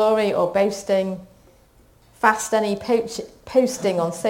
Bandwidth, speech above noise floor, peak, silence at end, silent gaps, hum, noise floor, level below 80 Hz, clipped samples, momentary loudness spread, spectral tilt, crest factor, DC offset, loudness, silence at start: 17 kHz; 33 dB; 0 dBFS; 0 s; none; none; -54 dBFS; -56 dBFS; under 0.1%; 9 LU; -4.5 dB/octave; 22 dB; under 0.1%; -21 LUFS; 0 s